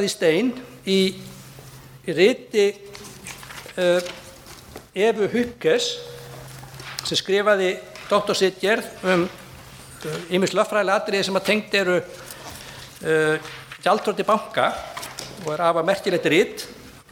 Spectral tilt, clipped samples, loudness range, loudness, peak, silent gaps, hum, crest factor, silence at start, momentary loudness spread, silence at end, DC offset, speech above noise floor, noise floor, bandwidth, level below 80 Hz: -4 dB/octave; under 0.1%; 2 LU; -22 LUFS; -4 dBFS; none; none; 20 dB; 0 s; 19 LU; 0.15 s; under 0.1%; 22 dB; -43 dBFS; 18 kHz; -56 dBFS